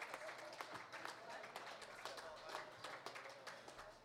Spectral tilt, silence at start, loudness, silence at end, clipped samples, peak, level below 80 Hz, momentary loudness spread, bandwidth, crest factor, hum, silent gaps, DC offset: -2 dB/octave; 0 s; -53 LUFS; 0 s; under 0.1%; -30 dBFS; -84 dBFS; 3 LU; 16 kHz; 22 dB; none; none; under 0.1%